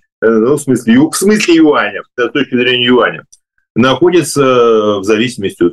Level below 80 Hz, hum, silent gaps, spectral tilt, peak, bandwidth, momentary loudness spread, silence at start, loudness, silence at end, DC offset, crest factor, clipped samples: -48 dBFS; none; 3.70-3.75 s; -4.5 dB/octave; 0 dBFS; 12.5 kHz; 7 LU; 0.2 s; -10 LUFS; 0 s; under 0.1%; 10 dB; under 0.1%